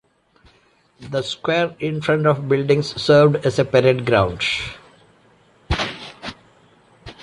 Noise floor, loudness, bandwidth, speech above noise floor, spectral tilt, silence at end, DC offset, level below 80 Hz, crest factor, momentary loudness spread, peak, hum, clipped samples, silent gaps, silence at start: -57 dBFS; -19 LUFS; 11.5 kHz; 40 dB; -6 dB/octave; 0.1 s; under 0.1%; -42 dBFS; 18 dB; 14 LU; -4 dBFS; none; under 0.1%; none; 1 s